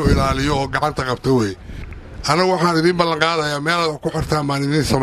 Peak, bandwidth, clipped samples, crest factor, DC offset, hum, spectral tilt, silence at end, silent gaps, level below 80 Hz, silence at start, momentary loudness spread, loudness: 0 dBFS; 15 kHz; under 0.1%; 18 dB; under 0.1%; none; -5.5 dB/octave; 0 s; none; -32 dBFS; 0 s; 9 LU; -18 LUFS